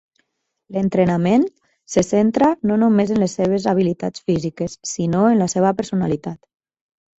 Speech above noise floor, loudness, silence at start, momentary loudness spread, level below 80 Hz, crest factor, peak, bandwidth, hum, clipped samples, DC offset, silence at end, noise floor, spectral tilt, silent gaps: 52 dB; -19 LUFS; 0.7 s; 9 LU; -52 dBFS; 16 dB; -4 dBFS; 8.2 kHz; none; under 0.1%; under 0.1%; 0.8 s; -69 dBFS; -6.5 dB/octave; none